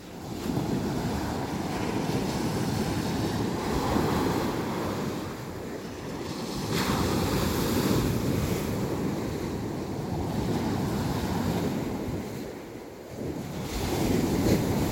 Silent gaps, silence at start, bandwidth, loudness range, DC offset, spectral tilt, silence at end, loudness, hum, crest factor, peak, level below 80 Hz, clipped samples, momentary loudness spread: none; 0 s; 17 kHz; 3 LU; under 0.1%; -5.5 dB/octave; 0 s; -29 LUFS; none; 18 dB; -10 dBFS; -42 dBFS; under 0.1%; 10 LU